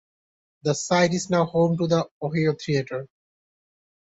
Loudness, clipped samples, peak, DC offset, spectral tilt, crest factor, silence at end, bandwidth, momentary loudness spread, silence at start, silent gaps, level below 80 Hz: -23 LUFS; under 0.1%; -8 dBFS; under 0.1%; -5.5 dB/octave; 18 dB; 1 s; 8.2 kHz; 8 LU; 0.65 s; 2.11-2.21 s; -60 dBFS